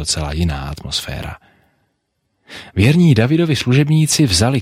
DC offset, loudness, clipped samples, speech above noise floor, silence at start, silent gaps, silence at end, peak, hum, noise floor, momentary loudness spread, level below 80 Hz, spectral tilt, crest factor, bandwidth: under 0.1%; -15 LUFS; under 0.1%; 54 dB; 0 s; none; 0 s; -2 dBFS; none; -69 dBFS; 16 LU; -34 dBFS; -5 dB/octave; 14 dB; 15.5 kHz